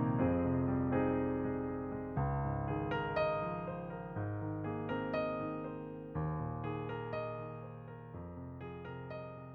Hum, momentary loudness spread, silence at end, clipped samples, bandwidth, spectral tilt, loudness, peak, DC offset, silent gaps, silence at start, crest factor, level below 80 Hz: none; 13 LU; 0 s; under 0.1%; 4.8 kHz; -10.5 dB/octave; -38 LUFS; -22 dBFS; under 0.1%; none; 0 s; 16 dB; -54 dBFS